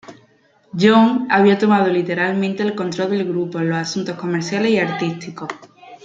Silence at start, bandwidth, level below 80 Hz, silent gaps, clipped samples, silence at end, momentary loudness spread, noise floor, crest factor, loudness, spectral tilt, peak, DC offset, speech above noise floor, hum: 0.1 s; 7.8 kHz; -64 dBFS; none; under 0.1%; 0.1 s; 15 LU; -55 dBFS; 16 dB; -17 LUFS; -6 dB/octave; -2 dBFS; under 0.1%; 38 dB; none